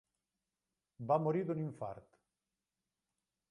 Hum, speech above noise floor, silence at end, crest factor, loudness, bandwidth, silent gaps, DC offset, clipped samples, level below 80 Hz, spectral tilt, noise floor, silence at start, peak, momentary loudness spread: none; over 53 dB; 1.5 s; 22 dB; -37 LUFS; 10.5 kHz; none; under 0.1%; under 0.1%; -78 dBFS; -10 dB/octave; under -90 dBFS; 1 s; -20 dBFS; 16 LU